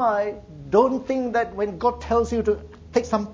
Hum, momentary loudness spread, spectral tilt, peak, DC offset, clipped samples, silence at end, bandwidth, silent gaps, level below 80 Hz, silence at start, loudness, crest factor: none; 7 LU; -6.5 dB/octave; -4 dBFS; under 0.1%; under 0.1%; 0 s; 7.8 kHz; none; -42 dBFS; 0 s; -23 LUFS; 18 dB